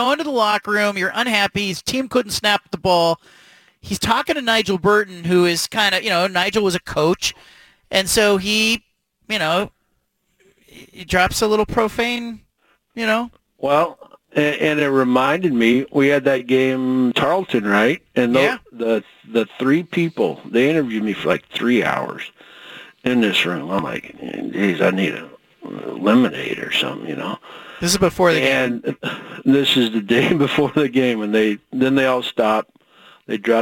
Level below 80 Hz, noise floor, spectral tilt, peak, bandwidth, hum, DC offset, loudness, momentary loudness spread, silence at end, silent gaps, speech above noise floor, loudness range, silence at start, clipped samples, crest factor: -48 dBFS; -68 dBFS; -4 dB/octave; -2 dBFS; 17 kHz; none; under 0.1%; -18 LUFS; 11 LU; 0 s; none; 50 dB; 4 LU; 0 s; under 0.1%; 16 dB